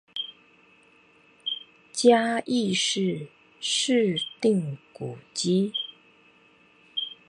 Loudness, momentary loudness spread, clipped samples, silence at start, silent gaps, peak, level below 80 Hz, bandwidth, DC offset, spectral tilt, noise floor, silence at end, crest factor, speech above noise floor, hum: -26 LUFS; 16 LU; under 0.1%; 0.15 s; none; -6 dBFS; -76 dBFS; 11.5 kHz; under 0.1%; -4 dB/octave; -59 dBFS; 0.15 s; 22 dB; 34 dB; none